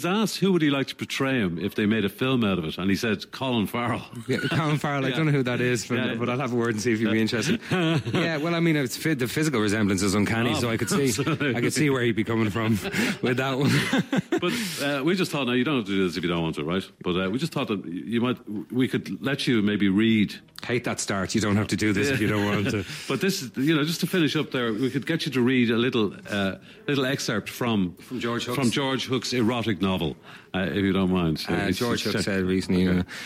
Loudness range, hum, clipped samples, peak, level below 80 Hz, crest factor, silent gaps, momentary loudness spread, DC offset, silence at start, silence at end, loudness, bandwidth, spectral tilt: 2 LU; none; under 0.1%; -10 dBFS; -56 dBFS; 14 dB; none; 6 LU; under 0.1%; 0 s; 0 s; -25 LUFS; 16 kHz; -5 dB/octave